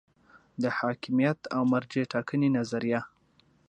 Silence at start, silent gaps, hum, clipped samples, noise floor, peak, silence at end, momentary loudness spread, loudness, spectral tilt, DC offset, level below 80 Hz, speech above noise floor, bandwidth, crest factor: 0.6 s; none; none; under 0.1%; -65 dBFS; -12 dBFS; 0.6 s; 6 LU; -29 LUFS; -7 dB/octave; under 0.1%; -70 dBFS; 37 dB; 8.8 kHz; 18 dB